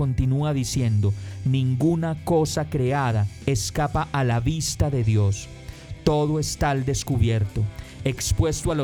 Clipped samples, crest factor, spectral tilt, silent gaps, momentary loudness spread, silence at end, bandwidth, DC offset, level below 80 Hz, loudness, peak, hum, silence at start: under 0.1%; 18 dB; -6 dB/octave; none; 6 LU; 0 s; 18 kHz; under 0.1%; -36 dBFS; -24 LUFS; -6 dBFS; none; 0 s